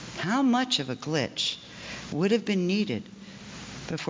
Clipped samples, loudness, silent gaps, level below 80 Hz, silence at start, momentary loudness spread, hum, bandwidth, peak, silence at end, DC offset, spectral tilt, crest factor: under 0.1%; -27 LUFS; none; -60 dBFS; 0 s; 17 LU; none; 7.6 kHz; -12 dBFS; 0 s; under 0.1%; -4.5 dB/octave; 16 dB